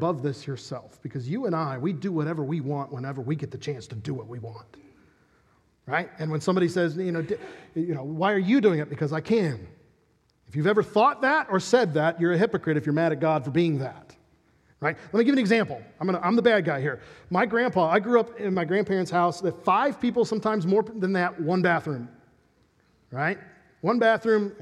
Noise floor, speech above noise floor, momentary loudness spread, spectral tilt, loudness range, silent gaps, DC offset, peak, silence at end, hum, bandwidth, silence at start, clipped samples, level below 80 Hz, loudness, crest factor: -66 dBFS; 41 dB; 13 LU; -7 dB/octave; 7 LU; none; under 0.1%; -6 dBFS; 0 s; none; 11.5 kHz; 0 s; under 0.1%; -66 dBFS; -25 LUFS; 20 dB